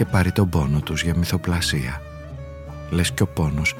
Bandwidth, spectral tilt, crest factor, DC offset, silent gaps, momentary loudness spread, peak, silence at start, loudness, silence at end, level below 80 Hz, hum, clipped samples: 17 kHz; -5 dB/octave; 16 dB; under 0.1%; none; 16 LU; -6 dBFS; 0 s; -22 LUFS; 0 s; -34 dBFS; none; under 0.1%